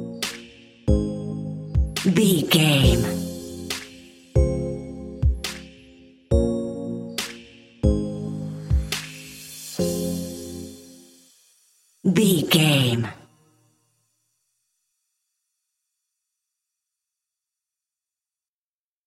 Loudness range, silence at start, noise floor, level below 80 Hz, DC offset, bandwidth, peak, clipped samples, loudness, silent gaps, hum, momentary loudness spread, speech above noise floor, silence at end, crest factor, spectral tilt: 8 LU; 0 s; under -90 dBFS; -32 dBFS; under 0.1%; 16.5 kHz; -4 dBFS; under 0.1%; -23 LUFS; none; none; 18 LU; over 72 dB; 5.9 s; 22 dB; -5 dB/octave